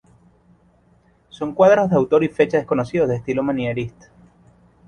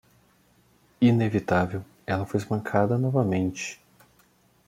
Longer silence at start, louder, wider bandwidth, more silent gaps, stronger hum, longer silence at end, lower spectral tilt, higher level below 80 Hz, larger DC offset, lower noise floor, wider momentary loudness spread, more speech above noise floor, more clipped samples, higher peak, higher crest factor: first, 1.35 s vs 1 s; first, -19 LUFS vs -26 LUFS; second, 9.6 kHz vs 15 kHz; neither; neither; about the same, 1 s vs 0.95 s; about the same, -7.5 dB/octave vs -7 dB/octave; first, -52 dBFS vs -62 dBFS; neither; second, -57 dBFS vs -62 dBFS; about the same, 14 LU vs 13 LU; about the same, 39 dB vs 38 dB; neither; first, -2 dBFS vs -8 dBFS; about the same, 18 dB vs 20 dB